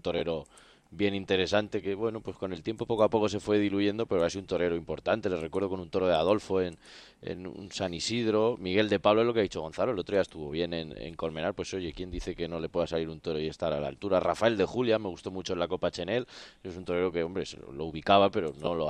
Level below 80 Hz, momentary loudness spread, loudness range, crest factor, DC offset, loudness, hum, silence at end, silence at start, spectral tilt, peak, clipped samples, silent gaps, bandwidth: -56 dBFS; 12 LU; 5 LU; 22 dB; under 0.1%; -30 LUFS; none; 0 s; 0.05 s; -5.5 dB/octave; -8 dBFS; under 0.1%; none; 10.5 kHz